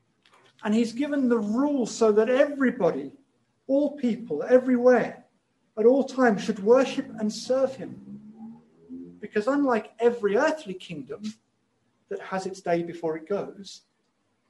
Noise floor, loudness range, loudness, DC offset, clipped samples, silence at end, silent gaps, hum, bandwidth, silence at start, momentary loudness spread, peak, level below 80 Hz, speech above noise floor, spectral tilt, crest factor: -73 dBFS; 7 LU; -25 LUFS; under 0.1%; under 0.1%; 0.7 s; none; none; 11 kHz; 0.6 s; 20 LU; -8 dBFS; -72 dBFS; 48 dB; -5.5 dB/octave; 18 dB